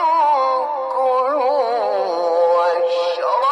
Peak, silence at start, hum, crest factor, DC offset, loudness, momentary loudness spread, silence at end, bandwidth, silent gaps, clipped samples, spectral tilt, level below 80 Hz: -6 dBFS; 0 s; none; 10 dB; under 0.1%; -18 LUFS; 4 LU; 0 s; 9.4 kHz; none; under 0.1%; -2.5 dB/octave; -80 dBFS